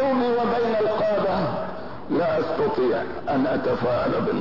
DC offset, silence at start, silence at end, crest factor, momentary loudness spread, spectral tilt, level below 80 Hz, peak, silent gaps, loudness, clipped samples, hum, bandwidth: 1%; 0 s; 0 s; 10 dB; 5 LU; -8 dB/octave; -52 dBFS; -12 dBFS; none; -23 LUFS; under 0.1%; none; 6 kHz